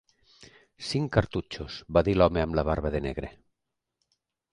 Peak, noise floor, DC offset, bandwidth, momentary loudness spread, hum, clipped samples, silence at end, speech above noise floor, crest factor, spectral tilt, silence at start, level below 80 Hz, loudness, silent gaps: -6 dBFS; -84 dBFS; under 0.1%; 11 kHz; 15 LU; none; under 0.1%; 1.2 s; 58 dB; 24 dB; -7 dB/octave; 0.4 s; -42 dBFS; -27 LUFS; none